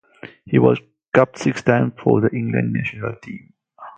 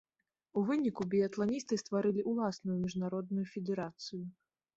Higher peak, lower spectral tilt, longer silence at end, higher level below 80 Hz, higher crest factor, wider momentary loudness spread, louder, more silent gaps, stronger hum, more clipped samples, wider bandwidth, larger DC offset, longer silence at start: first, 0 dBFS vs -20 dBFS; about the same, -7.5 dB/octave vs -6.5 dB/octave; second, 0.1 s vs 0.45 s; first, -54 dBFS vs -72 dBFS; about the same, 20 dB vs 16 dB; first, 13 LU vs 9 LU; first, -19 LUFS vs -35 LUFS; first, 1.08-1.12 s vs none; neither; neither; about the same, 8.8 kHz vs 8 kHz; neither; second, 0.25 s vs 0.55 s